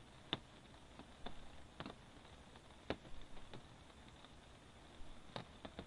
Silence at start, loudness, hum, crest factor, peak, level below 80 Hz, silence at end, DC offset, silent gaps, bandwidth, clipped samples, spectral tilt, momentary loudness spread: 0 s; -54 LUFS; none; 32 dB; -20 dBFS; -64 dBFS; 0 s; under 0.1%; none; 11 kHz; under 0.1%; -4.5 dB/octave; 14 LU